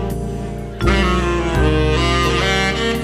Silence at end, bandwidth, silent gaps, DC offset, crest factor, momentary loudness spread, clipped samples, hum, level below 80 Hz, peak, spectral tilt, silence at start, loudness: 0 s; 14.5 kHz; none; under 0.1%; 16 dB; 9 LU; under 0.1%; none; -22 dBFS; 0 dBFS; -5 dB/octave; 0 s; -17 LUFS